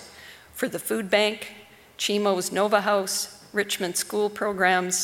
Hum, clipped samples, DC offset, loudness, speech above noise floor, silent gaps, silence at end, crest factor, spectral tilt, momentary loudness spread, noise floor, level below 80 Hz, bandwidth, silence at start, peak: none; under 0.1%; under 0.1%; -24 LUFS; 22 dB; none; 0 s; 20 dB; -2.5 dB/octave; 13 LU; -47 dBFS; -66 dBFS; 18.5 kHz; 0 s; -6 dBFS